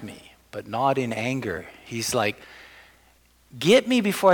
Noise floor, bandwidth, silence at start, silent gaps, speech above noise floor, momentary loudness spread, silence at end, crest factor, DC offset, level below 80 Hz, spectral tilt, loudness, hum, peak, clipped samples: -59 dBFS; 19.5 kHz; 0 s; none; 36 dB; 21 LU; 0 s; 18 dB; under 0.1%; -60 dBFS; -4.5 dB/octave; -24 LUFS; none; -6 dBFS; under 0.1%